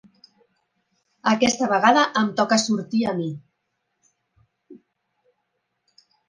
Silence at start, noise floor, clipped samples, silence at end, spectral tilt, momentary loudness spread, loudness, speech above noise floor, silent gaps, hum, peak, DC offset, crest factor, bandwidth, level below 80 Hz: 1.25 s; -76 dBFS; under 0.1%; 1.55 s; -3.5 dB/octave; 11 LU; -20 LUFS; 56 dB; none; none; -2 dBFS; under 0.1%; 22 dB; 10 kHz; -66 dBFS